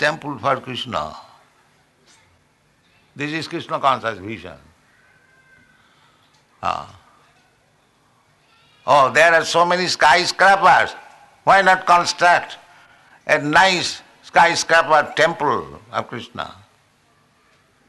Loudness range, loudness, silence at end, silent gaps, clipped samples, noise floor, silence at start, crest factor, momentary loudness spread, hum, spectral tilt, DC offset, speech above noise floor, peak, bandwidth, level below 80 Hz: 19 LU; -17 LUFS; 1.4 s; none; under 0.1%; -59 dBFS; 0 s; 16 dB; 18 LU; none; -3 dB/octave; under 0.1%; 42 dB; -2 dBFS; 12 kHz; -56 dBFS